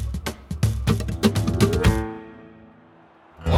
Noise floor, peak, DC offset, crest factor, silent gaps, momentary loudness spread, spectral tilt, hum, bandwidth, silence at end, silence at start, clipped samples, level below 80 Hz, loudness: -52 dBFS; -4 dBFS; under 0.1%; 20 dB; none; 14 LU; -6 dB/octave; none; 16.5 kHz; 0 s; 0 s; under 0.1%; -32 dBFS; -23 LUFS